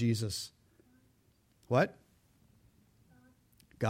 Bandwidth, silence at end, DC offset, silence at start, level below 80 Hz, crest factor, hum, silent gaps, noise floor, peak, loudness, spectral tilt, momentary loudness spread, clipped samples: 16.5 kHz; 0 s; under 0.1%; 0 s; -68 dBFS; 22 dB; none; none; -70 dBFS; -16 dBFS; -34 LUFS; -5.5 dB/octave; 10 LU; under 0.1%